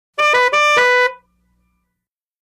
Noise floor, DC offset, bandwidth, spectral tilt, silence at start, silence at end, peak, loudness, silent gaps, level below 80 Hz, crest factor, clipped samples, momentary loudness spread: -80 dBFS; under 0.1%; 15 kHz; 0.5 dB/octave; 0.2 s; 1.25 s; -4 dBFS; -13 LUFS; none; -64 dBFS; 14 dB; under 0.1%; 4 LU